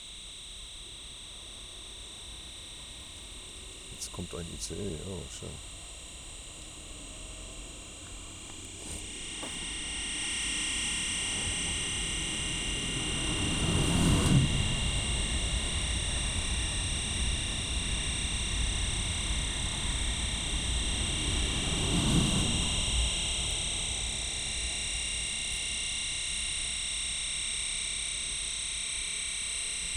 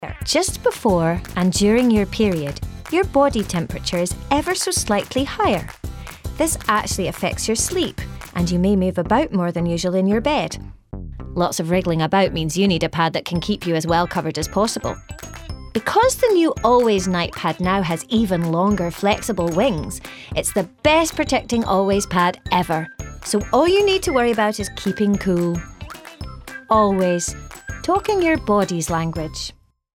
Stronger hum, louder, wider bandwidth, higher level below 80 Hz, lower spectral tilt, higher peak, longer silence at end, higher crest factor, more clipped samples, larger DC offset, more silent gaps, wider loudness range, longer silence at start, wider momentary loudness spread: neither; second, -30 LUFS vs -19 LUFS; second, 15 kHz vs 17.5 kHz; about the same, -38 dBFS vs -38 dBFS; second, -2.5 dB/octave vs -4.5 dB/octave; second, -14 dBFS vs 0 dBFS; second, 0 s vs 0.45 s; about the same, 20 dB vs 20 dB; neither; neither; neither; first, 13 LU vs 3 LU; about the same, 0 s vs 0 s; about the same, 15 LU vs 15 LU